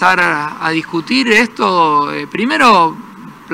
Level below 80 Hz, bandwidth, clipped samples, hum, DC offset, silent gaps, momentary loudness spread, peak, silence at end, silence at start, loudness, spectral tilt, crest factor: -54 dBFS; 16 kHz; 0.1%; none; under 0.1%; none; 9 LU; 0 dBFS; 0 s; 0 s; -12 LUFS; -4 dB/octave; 14 dB